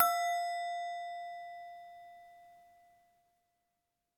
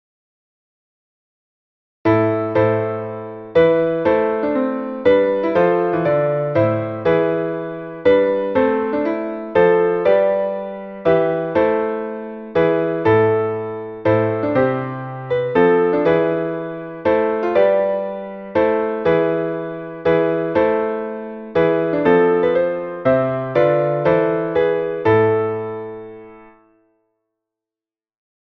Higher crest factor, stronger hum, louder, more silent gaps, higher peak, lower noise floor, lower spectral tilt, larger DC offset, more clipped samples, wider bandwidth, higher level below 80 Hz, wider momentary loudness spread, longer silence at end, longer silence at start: first, 28 dB vs 16 dB; neither; second, -37 LUFS vs -18 LUFS; neither; second, -12 dBFS vs -2 dBFS; second, -85 dBFS vs under -90 dBFS; second, 1 dB/octave vs -9.5 dB/octave; neither; neither; first, 19 kHz vs 5.8 kHz; second, -86 dBFS vs -52 dBFS; first, 23 LU vs 11 LU; second, 1.55 s vs 2.05 s; second, 0 s vs 2.05 s